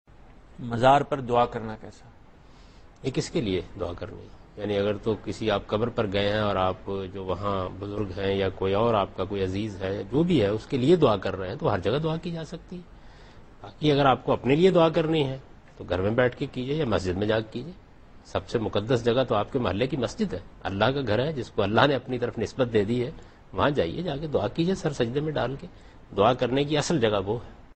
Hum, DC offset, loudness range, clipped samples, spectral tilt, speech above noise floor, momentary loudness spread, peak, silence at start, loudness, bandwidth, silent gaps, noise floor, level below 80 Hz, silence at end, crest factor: none; under 0.1%; 4 LU; under 0.1%; -6.5 dB/octave; 25 dB; 13 LU; -2 dBFS; 0.25 s; -26 LUFS; 8.8 kHz; none; -50 dBFS; -48 dBFS; 0.1 s; 24 dB